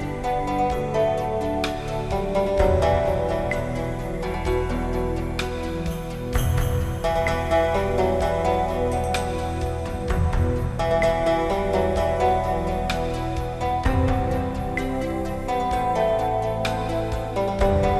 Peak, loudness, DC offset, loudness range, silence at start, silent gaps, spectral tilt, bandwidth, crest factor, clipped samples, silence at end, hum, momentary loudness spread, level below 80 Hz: -6 dBFS; -24 LUFS; under 0.1%; 3 LU; 0 s; none; -6.5 dB/octave; 13 kHz; 16 dB; under 0.1%; 0 s; none; 7 LU; -30 dBFS